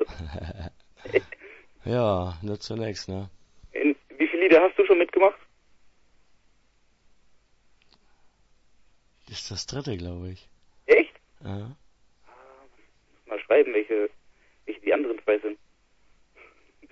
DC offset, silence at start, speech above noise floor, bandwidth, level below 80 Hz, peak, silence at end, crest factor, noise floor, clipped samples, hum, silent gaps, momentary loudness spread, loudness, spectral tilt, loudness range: under 0.1%; 0 s; 37 dB; 8 kHz; -54 dBFS; -4 dBFS; 1.35 s; 24 dB; -63 dBFS; under 0.1%; none; none; 22 LU; -25 LUFS; -6 dB/octave; 15 LU